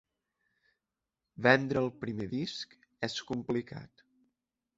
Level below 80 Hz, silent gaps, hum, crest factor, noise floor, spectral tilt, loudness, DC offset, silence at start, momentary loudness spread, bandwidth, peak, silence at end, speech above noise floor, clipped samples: -66 dBFS; none; none; 28 dB; -89 dBFS; -5.5 dB/octave; -32 LUFS; under 0.1%; 1.4 s; 18 LU; 8 kHz; -8 dBFS; 0.9 s; 57 dB; under 0.1%